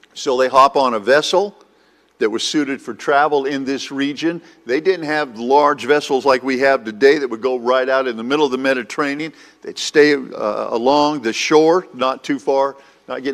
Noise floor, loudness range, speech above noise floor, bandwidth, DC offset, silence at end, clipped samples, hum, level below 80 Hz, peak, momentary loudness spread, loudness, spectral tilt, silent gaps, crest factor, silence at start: -55 dBFS; 3 LU; 38 dB; 13.5 kHz; under 0.1%; 0 s; under 0.1%; none; -64 dBFS; 0 dBFS; 9 LU; -17 LUFS; -3.5 dB/octave; none; 18 dB; 0.15 s